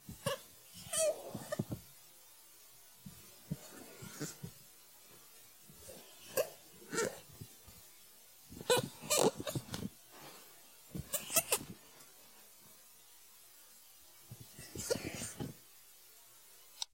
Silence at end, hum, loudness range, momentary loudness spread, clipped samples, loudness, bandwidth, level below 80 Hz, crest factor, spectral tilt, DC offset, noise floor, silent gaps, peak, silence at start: 0.1 s; none; 13 LU; 23 LU; under 0.1%; -38 LUFS; 16.5 kHz; -70 dBFS; 30 dB; -3 dB/octave; under 0.1%; -61 dBFS; none; -12 dBFS; 0 s